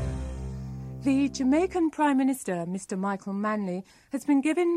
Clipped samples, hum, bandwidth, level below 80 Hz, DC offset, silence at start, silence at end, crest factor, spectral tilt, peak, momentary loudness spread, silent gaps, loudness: under 0.1%; none; 13.5 kHz; -44 dBFS; under 0.1%; 0 s; 0 s; 12 dB; -6 dB/octave; -14 dBFS; 13 LU; none; -28 LUFS